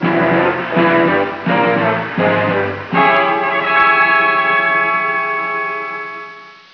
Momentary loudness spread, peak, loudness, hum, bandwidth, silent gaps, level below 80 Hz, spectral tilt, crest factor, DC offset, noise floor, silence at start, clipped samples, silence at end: 9 LU; -2 dBFS; -14 LUFS; none; 5.4 kHz; none; -56 dBFS; -7.5 dB/octave; 12 dB; under 0.1%; -35 dBFS; 0 s; under 0.1%; 0.2 s